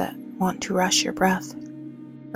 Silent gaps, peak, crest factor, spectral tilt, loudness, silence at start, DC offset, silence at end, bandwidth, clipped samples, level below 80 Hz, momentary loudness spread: none; -8 dBFS; 18 dB; -3.5 dB/octave; -23 LUFS; 0 s; under 0.1%; 0 s; 16 kHz; under 0.1%; -58 dBFS; 19 LU